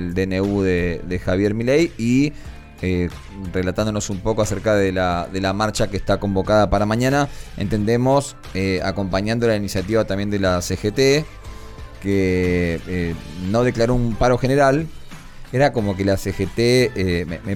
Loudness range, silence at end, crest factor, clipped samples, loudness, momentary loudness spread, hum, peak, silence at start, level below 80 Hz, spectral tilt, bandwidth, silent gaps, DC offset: 2 LU; 0 s; 14 dB; under 0.1%; -20 LUFS; 10 LU; none; -4 dBFS; 0 s; -34 dBFS; -6 dB/octave; 17.5 kHz; none; under 0.1%